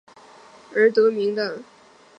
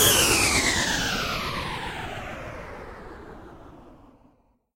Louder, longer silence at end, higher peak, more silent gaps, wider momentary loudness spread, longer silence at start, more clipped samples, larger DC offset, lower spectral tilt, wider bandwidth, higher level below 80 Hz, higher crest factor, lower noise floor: about the same, -21 LUFS vs -23 LUFS; second, 0.55 s vs 0.8 s; about the same, -6 dBFS vs -6 dBFS; neither; second, 12 LU vs 24 LU; first, 0.7 s vs 0 s; neither; neither; first, -5.5 dB/octave vs -1.5 dB/octave; second, 7.4 kHz vs 16 kHz; second, -78 dBFS vs -42 dBFS; about the same, 18 dB vs 20 dB; second, -48 dBFS vs -62 dBFS